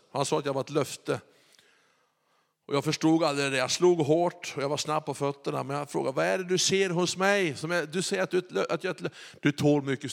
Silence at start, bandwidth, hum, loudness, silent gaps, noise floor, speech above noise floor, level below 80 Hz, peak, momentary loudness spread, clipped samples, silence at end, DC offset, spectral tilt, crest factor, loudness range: 0.15 s; 16 kHz; none; -28 LUFS; none; -72 dBFS; 44 dB; -76 dBFS; -10 dBFS; 8 LU; under 0.1%; 0 s; under 0.1%; -4.5 dB/octave; 18 dB; 3 LU